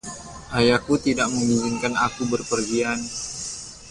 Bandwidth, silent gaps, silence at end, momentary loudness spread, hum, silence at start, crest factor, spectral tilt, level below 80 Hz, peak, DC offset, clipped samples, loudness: 11.5 kHz; none; 0 s; 12 LU; none; 0.05 s; 18 dB; -4 dB/octave; -48 dBFS; -6 dBFS; under 0.1%; under 0.1%; -23 LUFS